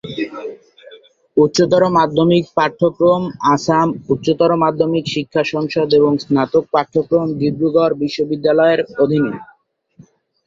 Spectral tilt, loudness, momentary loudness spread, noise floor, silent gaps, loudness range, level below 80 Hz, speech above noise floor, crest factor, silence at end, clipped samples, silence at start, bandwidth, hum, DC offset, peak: -6.5 dB/octave; -16 LUFS; 6 LU; -49 dBFS; none; 2 LU; -54 dBFS; 34 dB; 14 dB; 1.05 s; under 0.1%; 0.05 s; 7.6 kHz; none; under 0.1%; -2 dBFS